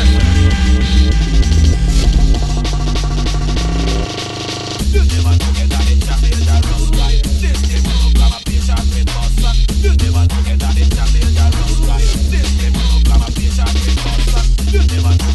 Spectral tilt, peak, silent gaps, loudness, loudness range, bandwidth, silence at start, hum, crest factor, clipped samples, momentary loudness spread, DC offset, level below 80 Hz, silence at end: -5 dB/octave; 0 dBFS; none; -14 LUFS; 2 LU; 12.5 kHz; 0 s; none; 12 dB; under 0.1%; 5 LU; under 0.1%; -12 dBFS; 0 s